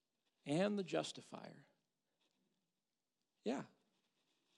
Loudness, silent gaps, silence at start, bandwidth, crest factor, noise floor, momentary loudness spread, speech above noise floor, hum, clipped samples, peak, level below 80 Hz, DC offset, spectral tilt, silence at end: -43 LUFS; none; 0.45 s; 11.5 kHz; 22 dB; under -90 dBFS; 17 LU; over 48 dB; none; under 0.1%; -26 dBFS; under -90 dBFS; under 0.1%; -5.5 dB/octave; 0.9 s